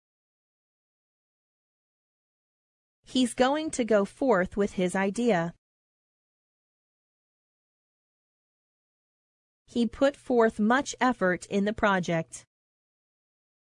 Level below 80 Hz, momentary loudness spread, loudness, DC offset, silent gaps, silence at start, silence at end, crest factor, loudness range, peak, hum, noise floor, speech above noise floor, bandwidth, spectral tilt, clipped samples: -60 dBFS; 6 LU; -27 LUFS; under 0.1%; 5.58-9.65 s; 3.1 s; 1.35 s; 20 dB; 8 LU; -10 dBFS; none; under -90 dBFS; over 64 dB; 11 kHz; -5 dB/octave; under 0.1%